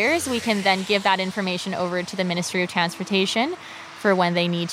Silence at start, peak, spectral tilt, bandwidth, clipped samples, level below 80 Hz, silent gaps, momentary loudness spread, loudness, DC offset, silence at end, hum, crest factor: 0 s; -4 dBFS; -4 dB/octave; 16 kHz; under 0.1%; -64 dBFS; none; 6 LU; -22 LUFS; under 0.1%; 0 s; none; 18 dB